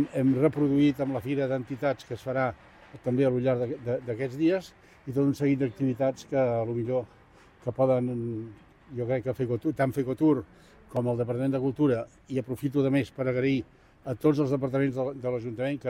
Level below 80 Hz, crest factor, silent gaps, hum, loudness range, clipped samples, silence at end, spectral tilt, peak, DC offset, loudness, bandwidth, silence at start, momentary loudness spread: -60 dBFS; 16 dB; none; none; 2 LU; under 0.1%; 0 s; -8.5 dB/octave; -12 dBFS; under 0.1%; -28 LUFS; 15 kHz; 0 s; 10 LU